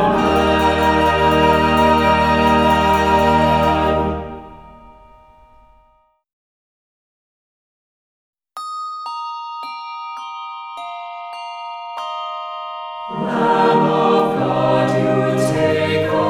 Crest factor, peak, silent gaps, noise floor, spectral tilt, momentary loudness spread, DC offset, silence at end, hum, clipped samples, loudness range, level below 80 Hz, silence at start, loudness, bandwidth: 16 dB; -2 dBFS; 6.33-8.33 s; -58 dBFS; -6 dB/octave; 16 LU; under 0.1%; 0 s; none; under 0.1%; 17 LU; -36 dBFS; 0 s; -16 LUFS; 18.5 kHz